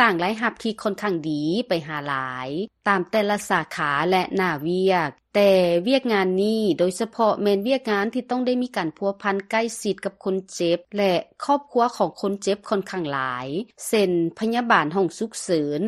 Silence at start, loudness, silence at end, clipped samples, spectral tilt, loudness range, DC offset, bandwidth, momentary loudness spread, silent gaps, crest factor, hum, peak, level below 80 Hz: 0 s; -23 LUFS; 0 s; under 0.1%; -5 dB/octave; 4 LU; under 0.1%; 13 kHz; 7 LU; none; 20 dB; none; -2 dBFS; -64 dBFS